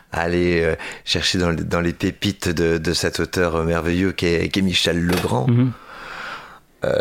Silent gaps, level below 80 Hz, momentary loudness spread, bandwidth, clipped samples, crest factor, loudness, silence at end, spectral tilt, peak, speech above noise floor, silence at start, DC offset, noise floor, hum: none; -40 dBFS; 12 LU; 16.5 kHz; under 0.1%; 16 dB; -20 LUFS; 0 s; -5 dB/octave; -4 dBFS; 20 dB; 0.1 s; under 0.1%; -39 dBFS; none